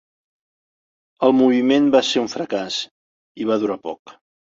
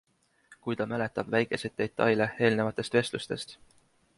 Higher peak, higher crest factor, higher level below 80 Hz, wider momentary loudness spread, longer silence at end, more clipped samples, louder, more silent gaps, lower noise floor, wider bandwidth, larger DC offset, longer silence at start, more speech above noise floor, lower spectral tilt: first, -2 dBFS vs -10 dBFS; about the same, 18 dB vs 20 dB; about the same, -64 dBFS vs -64 dBFS; first, 15 LU vs 11 LU; second, 0.4 s vs 0.65 s; neither; first, -19 LUFS vs -29 LUFS; first, 2.91-3.35 s, 3.99-4.05 s vs none; first, under -90 dBFS vs -60 dBFS; second, 7.8 kHz vs 11.5 kHz; neither; first, 1.2 s vs 0.5 s; first, over 72 dB vs 31 dB; about the same, -4.5 dB/octave vs -5.5 dB/octave